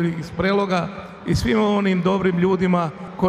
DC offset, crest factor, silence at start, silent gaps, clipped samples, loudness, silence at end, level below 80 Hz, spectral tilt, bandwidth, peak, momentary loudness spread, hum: under 0.1%; 16 dB; 0 s; none; under 0.1%; -20 LUFS; 0 s; -40 dBFS; -7 dB/octave; 12.5 kHz; -4 dBFS; 7 LU; none